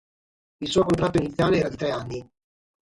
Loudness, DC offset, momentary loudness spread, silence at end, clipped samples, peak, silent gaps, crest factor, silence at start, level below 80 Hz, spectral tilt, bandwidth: -24 LUFS; under 0.1%; 13 LU; 0.75 s; under 0.1%; -8 dBFS; none; 18 dB; 0.6 s; -48 dBFS; -6 dB/octave; 11.5 kHz